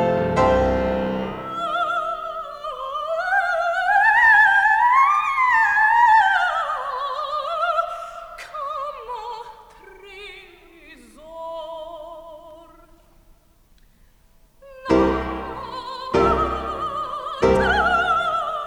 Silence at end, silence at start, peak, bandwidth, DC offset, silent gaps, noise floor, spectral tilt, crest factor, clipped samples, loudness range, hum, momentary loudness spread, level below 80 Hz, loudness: 0 s; 0 s; -4 dBFS; 19.5 kHz; under 0.1%; none; -55 dBFS; -5.5 dB/octave; 16 dB; under 0.1%; 22 LU; none; 20 LU; -40 dBFS; -19 LUFS